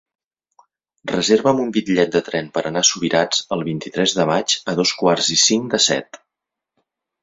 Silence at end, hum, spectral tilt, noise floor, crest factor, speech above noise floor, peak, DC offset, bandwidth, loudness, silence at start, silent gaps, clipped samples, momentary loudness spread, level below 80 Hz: 1.05 s; none; -3 dB/octave; -84 dBFS; 18 dB; 65 dB; -2 dBFS; under 0.1%; 8 kHz; -17 LUFS; 1.05 s; none; under 0.1%; 9 LU; -60 dBFS